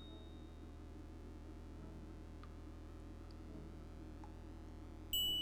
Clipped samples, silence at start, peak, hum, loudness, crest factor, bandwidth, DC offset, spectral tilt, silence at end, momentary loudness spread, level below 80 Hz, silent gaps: under 0.1%; 0 s; -30 dBFS; none; -49 LUFS; 18 dB; 19.5 kHz; under 0.1%; -3.5 dB/octave; 0 s; 8 LU; -56 dBFS; none